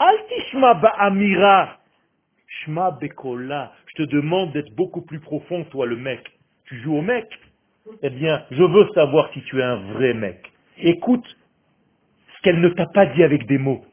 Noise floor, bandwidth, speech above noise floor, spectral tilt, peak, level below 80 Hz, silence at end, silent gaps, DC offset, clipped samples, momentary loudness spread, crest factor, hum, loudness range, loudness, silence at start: -67 dBFS; 3.6 kHz; 48 dB; -10.5 dB/octave; 0 dBFS; -58 dBFS; 0.15 s; none; under 0.1%; under 0.1%; 16 LU; 20 dB; none; 7 LU; -19 LUFS; 0 s